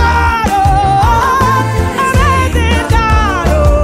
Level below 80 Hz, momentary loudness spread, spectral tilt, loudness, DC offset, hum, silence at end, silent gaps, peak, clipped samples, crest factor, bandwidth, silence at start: -16 dBFS; 2 LU; -5.5 dB/octave; -11 LUFS; under 0.1%; none; 0 s; none; 0 dBFS; under 0.1%; 10 dB; 15.5 kHz; 0 s